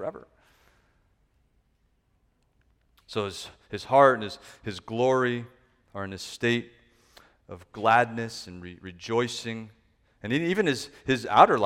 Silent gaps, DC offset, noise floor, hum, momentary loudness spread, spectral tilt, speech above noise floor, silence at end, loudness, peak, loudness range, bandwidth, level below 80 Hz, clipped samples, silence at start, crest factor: none; under 0.1%; -69 dBFS; none; 22 LU; -5 dB/octave; 43 dB; 0 s; -26 LUFS; -2 dBFS; 10 LU; 15 kHz; -62 dBFS; under 0.1%; 0 s; 26 dB